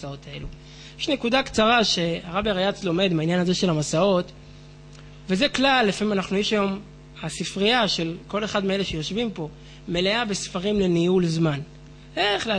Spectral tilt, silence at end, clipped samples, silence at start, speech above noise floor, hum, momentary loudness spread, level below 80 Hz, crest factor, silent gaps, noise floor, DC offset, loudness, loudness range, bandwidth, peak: -4.5 dB/octave; 0 s; under 0.1%; 0 s; 21 dB; none; 16 LU; -48 dBFS; 16 dB; none; -44 dBFS; under 0.1%; -23 LUFS; 3 LU; 10 kHz; -8 dBFS